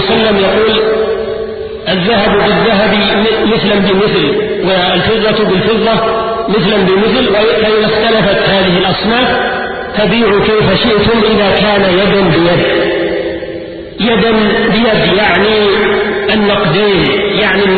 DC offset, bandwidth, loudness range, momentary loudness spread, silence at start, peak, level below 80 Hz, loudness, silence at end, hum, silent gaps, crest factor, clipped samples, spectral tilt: under 0.1%; 4.8 kHz; 1 LU; 6 LU; 0 s; 0 dBFS; -34 dBFS; -10 LUFS; 0 s; none; none; 10 dB; under 0.1%; -9 dB/octave